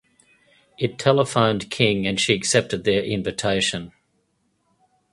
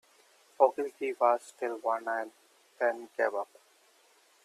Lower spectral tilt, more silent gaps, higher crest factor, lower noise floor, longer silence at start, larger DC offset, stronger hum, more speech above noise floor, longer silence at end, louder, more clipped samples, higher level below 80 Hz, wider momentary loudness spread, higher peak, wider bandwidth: about the same, -4 dB/octave vs -3 dB/octave; neither; about the same, 22 dB vs 24 dB; first, -69 dBFS vs -65 dBFS; first, 0.8 s vs 0.6 s; neither; neither; first, 48 dB vs 34 dB; first, 1.25 s vs 1 s; first, -21 LUFS vs -31 LUFS; neither; first, -52 dBFS vs under -90 dBFS; about the same, 8 LU vs 10 LU; first, 0 dBFS vs -10 dBFS; second, 11.5 kHz vs 13.5 kHz